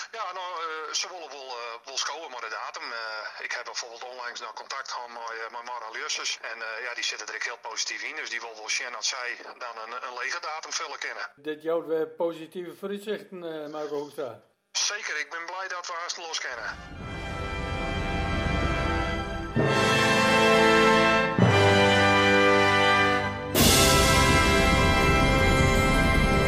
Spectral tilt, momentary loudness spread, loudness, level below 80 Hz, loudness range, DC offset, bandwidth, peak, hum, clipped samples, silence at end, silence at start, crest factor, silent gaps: -3.5 dB/octave; 17 LU; -24 LUFS; -38 dBFS; 14 LU; under 0.1%; 16 kHz; -8 dBFS; none; under 0.1%; 0 s; 0 s; 18 dB; none